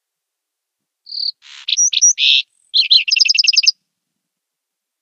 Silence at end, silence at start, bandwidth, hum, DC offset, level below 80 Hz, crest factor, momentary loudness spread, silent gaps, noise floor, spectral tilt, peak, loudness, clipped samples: 1.3 s; 1.1 s; 11.5 kHz; none; under 0.1%; under -90 dBFS; 18 dB; 12 LU; none; -80 dBFS; 11.5 dB/octave; 0 dBFS; -11 LUFS; under 0.1%